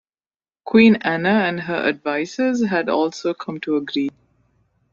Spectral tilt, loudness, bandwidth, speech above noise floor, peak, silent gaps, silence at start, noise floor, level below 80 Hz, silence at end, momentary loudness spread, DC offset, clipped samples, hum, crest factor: -6 dB/octave; -19 LUFS; 7.2 kHz; over 71 dB; -2 dBFS; none; 0.65 s; under -90 dBFS; -60 dBFS; 0.85 s; 12 LU; under 0.1%; under 0.1%; none; 18 dB